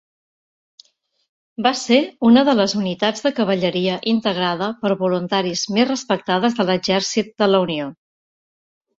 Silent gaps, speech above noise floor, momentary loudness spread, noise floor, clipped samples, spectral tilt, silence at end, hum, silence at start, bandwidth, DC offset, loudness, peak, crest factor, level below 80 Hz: none; 34 dB; 7 LU; -52 dBFS; under 0.1%; -4.5 dB/octave; 1.05 s; none; 1.6 s; 7.8 kHz; under 0.1%; -19 LUFS; -2 dBFS; 18 dB; -62 dBFS